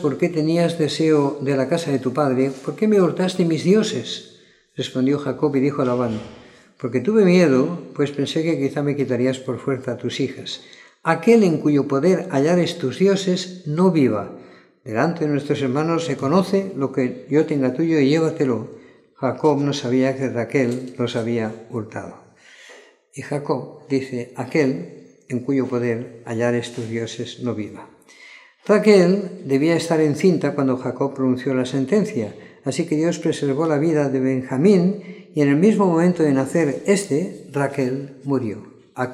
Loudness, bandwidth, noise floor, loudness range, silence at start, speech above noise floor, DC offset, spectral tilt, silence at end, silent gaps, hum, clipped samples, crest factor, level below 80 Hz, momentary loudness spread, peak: -20 LUFS; 12.5 kHz; -47 dBFS; 7 LU; 0 s; 28 dB; under 0.1%; -6.5 dB/octave; 0 s; none; none; under 0.1%; 20 dB; -68 dBFS; 12 LU; 0 dBFS